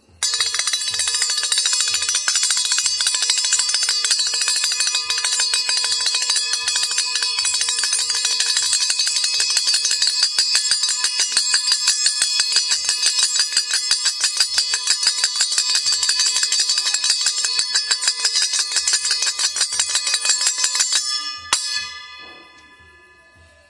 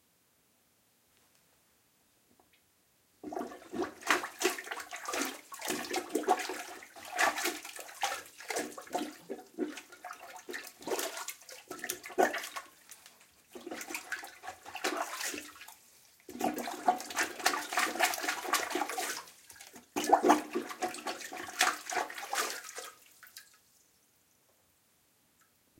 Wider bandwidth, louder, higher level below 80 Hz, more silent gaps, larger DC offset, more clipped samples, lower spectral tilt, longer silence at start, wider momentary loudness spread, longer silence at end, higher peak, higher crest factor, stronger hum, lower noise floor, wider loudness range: second, 11.5 kHz vs 17 kHz; first, -16 LUFS vs -35 LUFS; first, -66 dBFS vs -80 dBFS; neither; neither; neither; second, 4.5 dB/octave vs -1 dB/octave; second, 0.2 s vs 3.25 s; second, 3 LU vs 20 LU; second, 1.25 s vs 2.35 s; first, 0 dBFS vs -10 dBFS; second, 20 dB vs 28 dB; neither; second, -50 dBFS vs -71 dBFS; second, 2 LU vs 8 LU